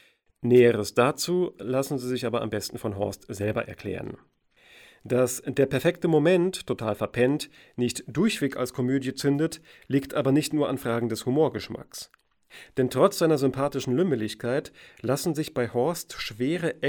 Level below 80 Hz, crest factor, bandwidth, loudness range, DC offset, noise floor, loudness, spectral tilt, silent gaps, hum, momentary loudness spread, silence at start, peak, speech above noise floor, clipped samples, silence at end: -60 dBFS; 20 dB; 19 kHz; 4 LU; under 0.1%; -56 dBFS; -26 LUFS; -5.5 dB/octave; none; none; 13 LU; 0.4 s; -6 dBFS; 30 dB; under 0.1%; 0 s